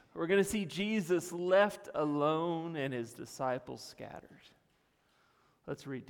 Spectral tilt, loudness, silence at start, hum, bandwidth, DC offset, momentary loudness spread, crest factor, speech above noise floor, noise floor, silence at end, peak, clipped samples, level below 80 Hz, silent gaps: -5 dB/octave; -33 LUFS; 0.15 s; none; 19 kHz; under 0.1%; 18 LU; 20 dB; 39 dB; -73 dBFS; 0.05 s; -16 dBFS; under 0.1%; -68 dBFS; none